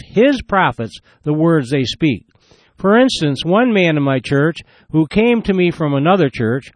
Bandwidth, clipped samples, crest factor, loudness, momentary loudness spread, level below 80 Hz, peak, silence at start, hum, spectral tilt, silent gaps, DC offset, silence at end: 10 kHz; under 0.1%; 14 dB; -15 LUFS; 8 LU; -44 dBFS; -2 dBFS; 0.15 s; none; -6.5 dB/octave; none; under 0.1%; 0.05 s